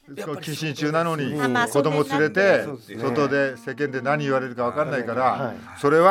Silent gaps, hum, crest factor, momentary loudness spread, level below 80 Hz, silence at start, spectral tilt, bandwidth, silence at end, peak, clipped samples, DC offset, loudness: none; none; 20 dB; 10 LU; -70 dBFS; 0.1 s; -5.5 dB/octave; 16.5 kHz; 0 s; -4 dBFS; under 0.1%; under 0.1%; -23 LUFS